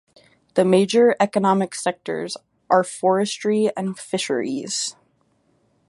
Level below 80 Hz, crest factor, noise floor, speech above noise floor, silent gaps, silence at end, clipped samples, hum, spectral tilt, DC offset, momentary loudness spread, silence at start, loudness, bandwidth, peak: -70 dBFS; 18 dB; -64 dBFS; 44 dB; none; 1 s; under 0.1%; none; -4.5 dB/octave; under 0.1%; 12 LU; 0.55 s; -21 LUFS; 11.5 kHz; -2 dBFS